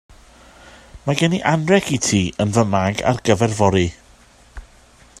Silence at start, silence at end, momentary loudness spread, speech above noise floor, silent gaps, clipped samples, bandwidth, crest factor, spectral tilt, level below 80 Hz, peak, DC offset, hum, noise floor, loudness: 0.65 s; 0.6 s; 4 LU; 32 dB; none; under 0.1%; 14 kHz; 20 dB; -5 dB/octave; -46 dBFS; 0 dBFS; under 0.1%; none; -49 dBFS; -18 LUFS